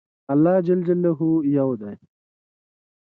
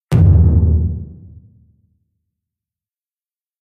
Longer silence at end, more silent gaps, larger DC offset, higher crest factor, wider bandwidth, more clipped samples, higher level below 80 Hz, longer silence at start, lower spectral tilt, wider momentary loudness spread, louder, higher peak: second, 1.1 s vs 2.5 s; neither; neither; about the same, 14 dB vs 16 dB; about the same, 4.3 kHz vs 4 kHz; neither; second, -66 dBFS vs -22 dBFS; first, 0.3 s vs 0.1 s; first, -12.5 dB/octave vs -10 dB/octave; second, 8 LU vs 19 LU; second, -20 LUFS vs -13 LUFS; second, -8 dBFS vs -2 dBFS